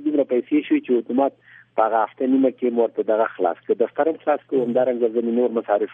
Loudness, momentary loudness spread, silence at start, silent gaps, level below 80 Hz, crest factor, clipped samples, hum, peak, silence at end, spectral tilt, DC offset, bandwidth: -21 LUFS; 3 LU; 0 s; none; -76 dBFS; 16 dB; under 0.1%; none; -4 dBFS; 0 s; -9.5 dB/octave; under 0.1%; 3.8 kHz